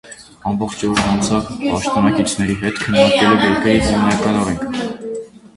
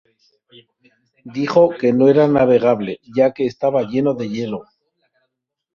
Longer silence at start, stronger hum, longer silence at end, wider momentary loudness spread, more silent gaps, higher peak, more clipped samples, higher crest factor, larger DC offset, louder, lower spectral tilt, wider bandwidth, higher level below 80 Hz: second, 0.05 s vs 1.25 s; neither; second, 0.3 s vs 1.15 s; about the same, 11 LU vs 12 LU; neither; about the same, 0 dBFS vs -2 dBFS; neither; about the same, 16 dB vs 16 dB; neither; about the same, -16 LUFS vs -17 LUFS; second, -5 dB/octave vs -8 dB/octave; first, 11.5 kHz vs 7 kHz; first, -38 dBFS vs -58 dBFS